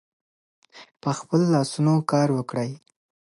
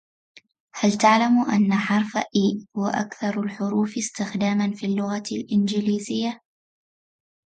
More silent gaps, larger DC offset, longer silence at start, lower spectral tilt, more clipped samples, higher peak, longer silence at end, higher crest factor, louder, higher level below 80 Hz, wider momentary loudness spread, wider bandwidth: neither; neither; about the same, 0.75 s vs 0.75 s; first, -7 dB/octave vs -5 dB/octave; neither; second, -8 dBFS vs -4 dBFS; second, 0.6 s vs 1.2 s; about the same, 18 dB vs 18 dB; about the same, -23 LUFS vs -23 LUFS; about the same, -70 dBFS vs -68 dBFS; about the same, 11 LU vs 9 LU; first, 11.5 kHz vs 9.2 kHz